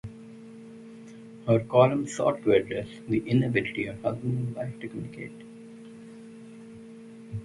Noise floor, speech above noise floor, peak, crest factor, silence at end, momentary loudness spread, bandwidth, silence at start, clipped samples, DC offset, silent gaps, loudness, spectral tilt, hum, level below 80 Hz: -46 dBFS; 20 dB; -6 dBFS; 22 dB; 0 s; 23 LU; 11.5 kHz; 0.05 s; under 0.1%; under 0.1%; none; -27 LUFS; -7 dB/octave; none; -60 dBFS